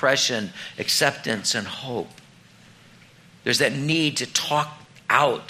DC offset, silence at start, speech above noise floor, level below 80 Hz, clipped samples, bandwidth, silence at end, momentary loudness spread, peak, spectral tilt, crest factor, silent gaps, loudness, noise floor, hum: under 0.1%; 0 s; 28 dB; -66 dBFS; under 0.1%; 16 kHz; 0 s; 12 LU; -2 dBFS; -2.5 dB/octave; 24 dB; none; -23 LUFS; -51 dBFS; none